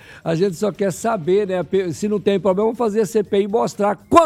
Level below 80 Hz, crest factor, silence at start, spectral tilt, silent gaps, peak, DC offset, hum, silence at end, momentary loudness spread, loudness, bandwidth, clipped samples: -52 dBFS; 18 dB; 0.1 s; -6 dB/octave; none; 0 dBFS; under 0.1%; none; 0 s; 4 LU; -19 LUFS; 14.5 kHz; under 0.1%